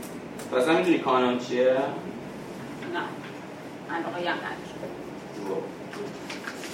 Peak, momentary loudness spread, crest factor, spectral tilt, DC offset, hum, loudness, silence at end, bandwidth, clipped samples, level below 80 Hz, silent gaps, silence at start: -10 dBFS; 16 LU; 20 dB; -5 dB/octave; under 0.1%; none; -29 LUFS; 0 s; 16 kHz; under 0.1%; -66 dBFS; none; 0 s